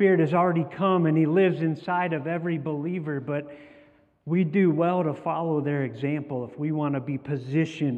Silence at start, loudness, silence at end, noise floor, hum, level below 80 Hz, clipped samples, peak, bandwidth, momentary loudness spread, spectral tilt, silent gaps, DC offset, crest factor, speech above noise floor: 0 s; -26 LUFS; 0 s; -56 dBFS; none; -72 dBFS; under 0.1%; -10 dBFS; 7.6 kHz; 9 LU; -9 dB/octave; none; under 0.1%; 16 dB; 32 dB